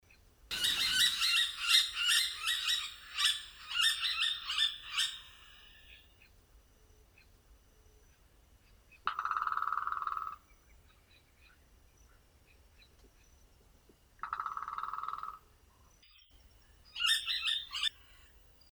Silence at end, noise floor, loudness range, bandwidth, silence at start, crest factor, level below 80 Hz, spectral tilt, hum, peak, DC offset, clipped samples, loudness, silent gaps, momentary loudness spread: 0.8 s; -64 dBFS; 16 LU; over 20 kHz; 0.45 s; 24 dB; -64 dBFS; 2.5 dB/octave; none; -12 dBFS; under 0.1%; under 0.1%; -32 LUFS; none; 15 LU